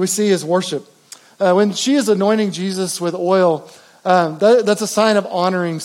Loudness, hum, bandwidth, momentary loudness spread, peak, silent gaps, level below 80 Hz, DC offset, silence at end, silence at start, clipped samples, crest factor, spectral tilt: -16 LUFS; none; 17 kHz; 7 LU; -2 dBFS; none; -82 dBFS; under 0.1%; 0 s; 0 s; under 0.1%; 14 dB; -4.5 dB/octave